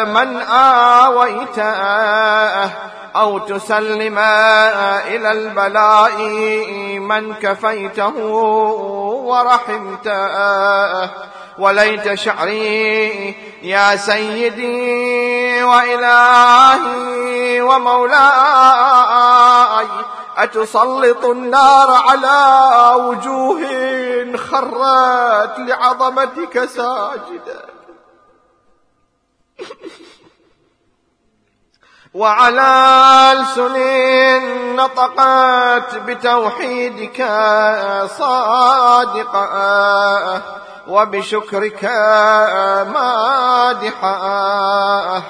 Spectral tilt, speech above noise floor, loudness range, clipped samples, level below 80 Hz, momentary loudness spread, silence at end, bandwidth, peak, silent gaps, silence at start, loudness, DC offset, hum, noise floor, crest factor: -3 dB/octave; 50 dB; 6 LU; 0.1%; -62 dBFS; 12 LU; 0 s; 11 kHz; 0 dBFS; none; 0 s; -12 LUFS; under 0.1%; none; -63 dBFS; 14 dB